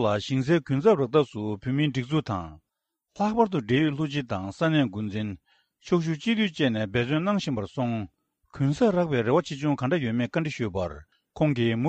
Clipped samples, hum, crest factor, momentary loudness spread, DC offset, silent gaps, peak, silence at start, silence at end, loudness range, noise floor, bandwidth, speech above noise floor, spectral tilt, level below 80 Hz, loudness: under 0.1%; none; 18 dB; 9 LU; under 0.1%; none; -8 dBFS; 0 s; 0 s; 1 LU; -83 dBFS; 8.6 kHz; 58 dB; -7 dB/octave; -56 dBFS; -26 LUFS